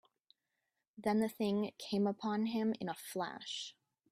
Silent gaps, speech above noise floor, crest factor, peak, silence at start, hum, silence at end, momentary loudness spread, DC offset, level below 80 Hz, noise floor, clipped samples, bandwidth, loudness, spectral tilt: none; 51 dB; 18 dB; -22 dBFS; 0.95 s; none; 0.4 s; 8 LU; under 0.1%; -80 dBFS; -87 dBFS; under 0.1%; 15.5 kHz; -38 LUFS; -5.5 dB/octave